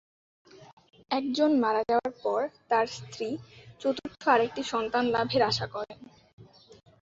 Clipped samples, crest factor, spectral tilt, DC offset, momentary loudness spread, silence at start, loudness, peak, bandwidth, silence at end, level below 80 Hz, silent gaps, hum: under 0.1%; 20 dB; -5 dB/octave; under 0.1%; 11 LU; 0.55 s; -28 LUFS; -10 dBFS; 8 kHz; 0.25 s; -64 dBFS; 0.73-0.77 s, 6.33-6.38 s; none